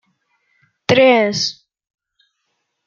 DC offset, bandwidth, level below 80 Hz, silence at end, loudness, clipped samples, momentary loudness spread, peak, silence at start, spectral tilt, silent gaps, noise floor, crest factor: under 0.1%; 7.4 kHz; -66 dBFS; 1.35 s; -14 LUFS; under 0.1%; 11 LU; 0 dBFS; 0.9 s; -4 dB/octave; none; -72 dBFS; 20 dB